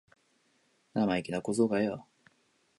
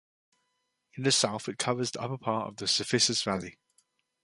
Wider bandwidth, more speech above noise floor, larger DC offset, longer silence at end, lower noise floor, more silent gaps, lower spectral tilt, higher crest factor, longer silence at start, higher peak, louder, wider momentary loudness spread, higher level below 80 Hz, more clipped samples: about the same, 11.5 kHz vs 11.5 kHz; second, 41 dB vs 49 dB; neither; about the same, 0.75 s vs 0.7 s; second, -71 dBFS vs -79 dBFS; neither; first, -6 dB/octave vs -3 dB/octave; about the same, 20 dB vs 22 dB; about the same, 0.95 s vs 0.95 s; second, -14 dBFS vs -10 dBFS; second, -31 LUFS vs -28 LUFS; about the same, 9 LU vs 10 LU; about the same, -68 dBFS vs -68 dBFS; neither